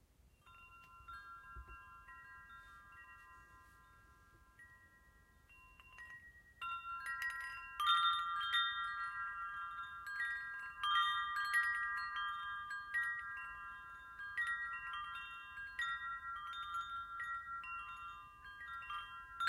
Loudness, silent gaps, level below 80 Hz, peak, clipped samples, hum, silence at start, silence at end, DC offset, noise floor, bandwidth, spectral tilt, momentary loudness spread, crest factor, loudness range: -40 LUFS; none; -70 dBFS; -22 dBFS; under 0.1%; none; 0.25 s; 0 s; under 0.1%; -68 dBFS; 16 kHz; 0 dB/octave; 23 LU; 22 dB; 21 LU